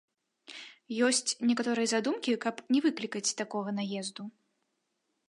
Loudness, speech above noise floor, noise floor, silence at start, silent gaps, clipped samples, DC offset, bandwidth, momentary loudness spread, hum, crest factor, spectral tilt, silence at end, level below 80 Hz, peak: -30 LUFS; 50 dB; -80 dBFS; 0.5 s; none; under 0.1%; under 0.1%; 11.5 kHz; 18 LU; none; 16 dB; -3 dB/octave; 1 s; -86 dBFS; -16 dBFS